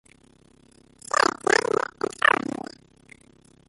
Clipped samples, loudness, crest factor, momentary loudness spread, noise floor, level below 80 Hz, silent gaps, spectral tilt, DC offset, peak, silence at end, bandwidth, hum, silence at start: under 0.1%; -23 LUFS; 22 dB; 16 LU; -57 dBFS; -64 dBFS; none; -2.5 dB/octave; under 0.1%; -4 dBFS; 1.35 s; 11.5 kHz; none; 1.15 s